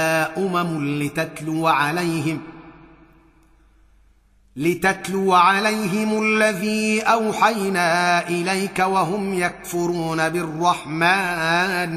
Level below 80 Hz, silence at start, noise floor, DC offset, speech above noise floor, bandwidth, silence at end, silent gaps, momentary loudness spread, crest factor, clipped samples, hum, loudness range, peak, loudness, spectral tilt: -56 dBFS; 0 s; -56 dBFS; under 0.1%; 36 dB; 15.5 kHz; 0 s; none; 7 LU; 18 dB; under 0.1%; none; 7 LU; -2 dBFS; -20 LUFS; -4.5 dB/octave